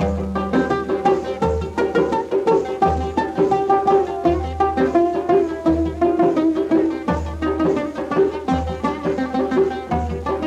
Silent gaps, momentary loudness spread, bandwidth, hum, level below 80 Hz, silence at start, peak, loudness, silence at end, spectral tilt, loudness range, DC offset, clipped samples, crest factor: none; 6 LU; 9.4 kHz; none; -34 dBFS; 0 s; -4 dBFS; -19 LUFS; 0 s; -7.5 dB/octave; 3 LU; under 0.1%; under 0.1%; 14 dB